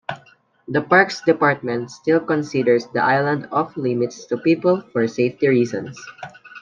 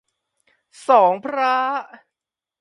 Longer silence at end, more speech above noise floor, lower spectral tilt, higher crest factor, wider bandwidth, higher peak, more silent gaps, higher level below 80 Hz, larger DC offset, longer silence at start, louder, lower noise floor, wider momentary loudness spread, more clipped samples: second, 0 s vs 0.75 s; second, 33 dB vs 69 dB; first, -6.5 dB/octave vs -4.5 dB/octave; about the same, 18 dB vs 20 dB; second, 7.6 kHz vs 11.5 kHz; about the same, -2 dBFS vs -2 dBFS; neither; first, -64 dBFS vs -80 dBFS; neither; second, 0.1 s vs 0.9 s; about the same, -19 LUFS vs -18 LUFS; second, -53 dBFS vs -88 dBFS; first, 17 LU vs 13 LU; neither